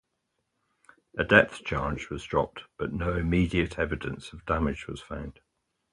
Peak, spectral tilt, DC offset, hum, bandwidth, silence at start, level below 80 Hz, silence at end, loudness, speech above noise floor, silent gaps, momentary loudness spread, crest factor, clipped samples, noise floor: 0 dBFS; -6.5 dB/octave; under 0.1%; none; 11.5 kHz; 1.15 s; -42 dBFS; 0.6 s; -28 LUFS; 51 dB; none; 18 LU; 28 dB; under 0.1%; -79 dBFS